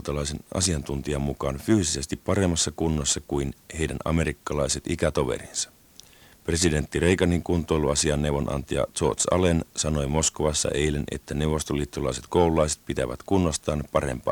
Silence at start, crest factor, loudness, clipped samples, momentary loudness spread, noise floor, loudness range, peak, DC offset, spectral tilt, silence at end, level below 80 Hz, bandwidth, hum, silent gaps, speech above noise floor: 0 s; 20 dB; -25 LUFS; under 0.1%; 7 LU; -52 dBFS; 3 LU; -6 dBFS; under 0.1%; -4.5 dB/octave; 0 s; -38 dBFS; 19.5 kHz; none; none; 27 dB